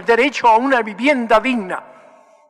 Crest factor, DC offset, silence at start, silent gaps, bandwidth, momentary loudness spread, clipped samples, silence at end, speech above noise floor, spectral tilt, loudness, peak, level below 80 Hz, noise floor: 12 dB; under 0.1%; 0 s; none; 12 kHz; 11 LU; under 0.1%; 0.65 s; 32 dB; -4 dB/octave; -15 LUFS; -4 dBFS; -52 dBFS; -47 dBFS